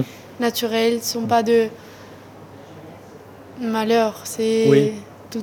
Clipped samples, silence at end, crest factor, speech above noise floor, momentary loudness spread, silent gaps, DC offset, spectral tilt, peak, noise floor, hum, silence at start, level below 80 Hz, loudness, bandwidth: under 0.1%; 0 s; 18 dB; 23 dB; 25 LU; none; under 0.1%; -5 dB/octave; -2 dBFS; -42 dBFS; none; 0 s; -64 dBFS; -20 LUFS; 19.5 kHz